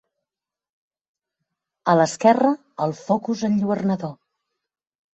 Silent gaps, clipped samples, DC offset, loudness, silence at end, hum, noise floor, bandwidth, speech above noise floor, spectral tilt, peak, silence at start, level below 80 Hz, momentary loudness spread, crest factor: none; under 0.1%; under 0.1%; -21 LUFS; 1 s; none; -89 dBFS; 8.2 kHz; 69 dB; -6.5 dB/octave; -2 dBFS; 1.85 s; -66 dBFS; 11 LU; 22 dB